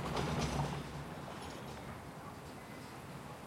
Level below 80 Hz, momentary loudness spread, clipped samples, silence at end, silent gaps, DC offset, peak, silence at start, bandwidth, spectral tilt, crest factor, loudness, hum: -54 dBFS; 12 LU; under 0.1%; 0 s; none; under 0.1%; -22 dBFS; 0 s; 16.5 kHz; -5.5 dB/octave; 20 dB; -43 LUFS; none